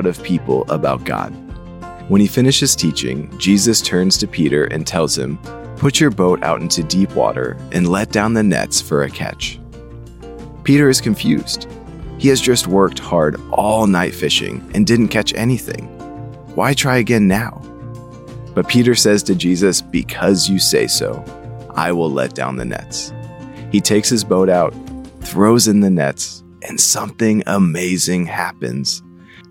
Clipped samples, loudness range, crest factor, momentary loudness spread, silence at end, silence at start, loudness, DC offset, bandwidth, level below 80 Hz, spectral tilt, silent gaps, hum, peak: under 0.1%; 3 LU; 16 dB; 20 LU; 0.1 s; 0 s; -15 LUFS; under 0.1%; 16.5 kHz; -40 dBFS; -4 dB/octave; none; none; 0 dBFS